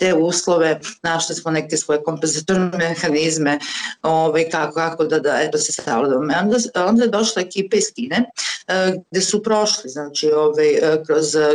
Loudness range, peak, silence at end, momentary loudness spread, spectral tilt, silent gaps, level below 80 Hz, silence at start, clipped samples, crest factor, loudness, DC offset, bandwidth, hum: 1 LU; -8 dBFS; 0 s; 5 LU; -3.5 dB/octave; none; -62 dBFS; 0 s; under 0.1%; 10 dB; -18 LUFS; under 0.1%; 11.5 kHz; none